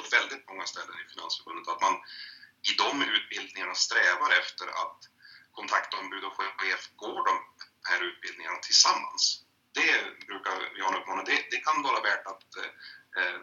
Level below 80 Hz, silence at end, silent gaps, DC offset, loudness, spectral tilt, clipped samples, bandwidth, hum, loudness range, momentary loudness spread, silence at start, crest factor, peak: -90 dBFS; 0 s; none; under 0.1%; -28 LUFS; 1.5 dB/octave; under 0.1%; 11.5 kHz; none; 5 LU; 16 LU; 0 s; 24 dB; -6 dBFS